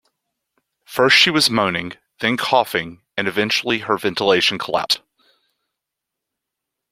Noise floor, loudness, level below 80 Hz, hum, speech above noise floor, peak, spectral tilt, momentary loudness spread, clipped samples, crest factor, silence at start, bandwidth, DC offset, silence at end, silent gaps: -82 dBFS; -17 LUFS; -60 dBFS; none; 64 dB; 0 dBFS; -3 dB/octave; 12 LU; under 0.1%; 20 dB; 0.9 s; 16.5 kHz; under 0.1%; 1.95 s; none